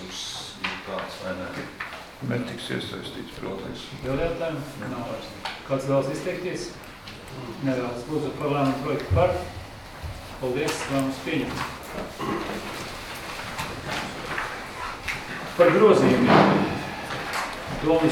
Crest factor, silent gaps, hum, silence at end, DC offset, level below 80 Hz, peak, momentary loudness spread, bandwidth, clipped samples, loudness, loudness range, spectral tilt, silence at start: 24 dB; none; none; 0 s; under 0.1%; -46 dBFS; -2 dBFS; 16 LU; 19 kHz; under 0.1%; -26 LUFS; 10 LU; -5.5 dB/octave; 0 s